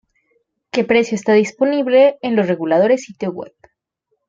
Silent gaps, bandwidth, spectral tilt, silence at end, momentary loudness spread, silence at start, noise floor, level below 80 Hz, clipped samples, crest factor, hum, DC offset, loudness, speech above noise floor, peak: none; 7.8 kHz; -5.5 dB/octave; 0.8 s; 13 LU; 0.75 s; -71 dBFS; -62 dBFS; under 0.1%; 16 dB; none; under 0.1%; -16 LUFS; 56 dB; -2 dBFS